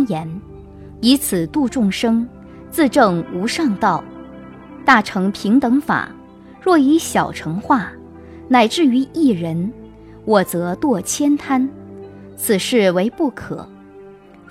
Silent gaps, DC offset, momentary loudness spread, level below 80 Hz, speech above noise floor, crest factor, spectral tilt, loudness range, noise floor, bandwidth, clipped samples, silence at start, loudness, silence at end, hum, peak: none; under 0.1%; 18 LU; -48 dBFS; 25 dB; 18 dB; -5 dB/octave; 2 LU; -41 dBFS; 16 kHz; under 0.1%; 0 s; -17 LUFS; 0.4 s; none; 0 dBFS